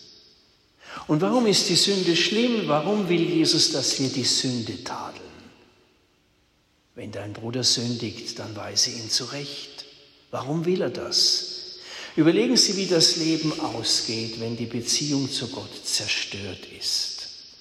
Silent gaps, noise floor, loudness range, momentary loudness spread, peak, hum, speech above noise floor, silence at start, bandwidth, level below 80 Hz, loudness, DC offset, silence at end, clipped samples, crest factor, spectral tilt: none; -64 dBFS; 8 LU; 17 LU; -4 dBFS; none; 40 dB; 0 s; 15 kHz; -66 dBFS; -22 LUFS; under 0.1%; 0.05 s; under 0.1%; 22 dB; -3 dB/octave